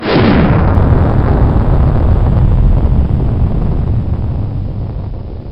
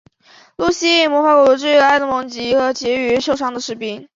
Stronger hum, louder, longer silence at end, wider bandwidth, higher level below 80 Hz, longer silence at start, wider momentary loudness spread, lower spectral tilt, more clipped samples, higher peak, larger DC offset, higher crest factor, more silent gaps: neither; first, -12 LUFS vs -15 LUFS; about the same, 0 s vs 0.1 s; second, 5.6 kHz vs 7.6 kHz; first, -14 dBFS vs -54 dBFS; second, 0 s vs 0.6 s; about the same, 11 LU vs 10 LU; first, -10.5 dB/octave vs -3 dB/octave; neither; about the same, 0 dBFS vs -2 dBFS; first, 1% vs under 0.1%; about the same, 10 dB vs 14 dB; neither